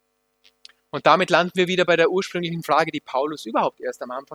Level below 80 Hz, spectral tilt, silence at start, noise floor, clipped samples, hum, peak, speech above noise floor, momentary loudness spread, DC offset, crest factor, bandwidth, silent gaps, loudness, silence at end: -66 dBFS; -5 dB/octave; 0.95 s; -62 dBFS; under 0.1%; none; 0 dBFS; 41 dB; 12 LU; under 0.1%; 22 dB; 16.5 kHz; none; -21 LUFS; 0 s